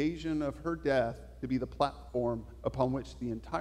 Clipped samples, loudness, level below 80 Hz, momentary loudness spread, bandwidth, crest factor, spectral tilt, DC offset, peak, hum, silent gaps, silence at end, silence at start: under 0.1%; -34 LUFS; -50 dBFS; 7 LU; 12 kHz; 20 dB; -7 dB/octave; under 0.1%; -14 dBFS; none; none; 0 s; 0 s